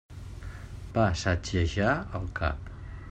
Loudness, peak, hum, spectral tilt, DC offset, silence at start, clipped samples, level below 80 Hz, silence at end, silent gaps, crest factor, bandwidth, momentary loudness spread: -29 LUFS; -12 dBFS; none; -6 dB/octave; under 0.1%; 0.1 s; under 0.1%; -42 dBFS; 0 s; none; 18 dB; 9.2 kHz; 17 LU